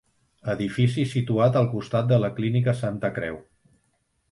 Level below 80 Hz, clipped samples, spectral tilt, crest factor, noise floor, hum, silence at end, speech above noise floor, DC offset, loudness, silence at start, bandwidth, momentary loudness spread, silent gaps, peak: -56 dBFS; under 0.1%; -8 dB/octave; 16 dB; -70 dBFS; none; 0.9 s; 47 dB; under 0.1%; -24 LUFS; 0.45 s; 11.5 kHz; 11 LU; none; -8 dBFS